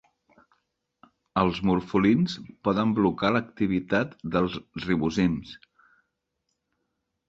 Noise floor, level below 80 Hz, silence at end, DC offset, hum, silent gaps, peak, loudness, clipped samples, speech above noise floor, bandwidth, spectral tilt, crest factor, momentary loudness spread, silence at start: -79 dBFS; -52 dBFS; 1.7 s; under 0.1%; none; none; -6 dBFS; -26 LUFS; under 0.1%; 54 dB; 7.6 kHz; -7 dB/octave; 20 dB; 8 LU; 1.35 s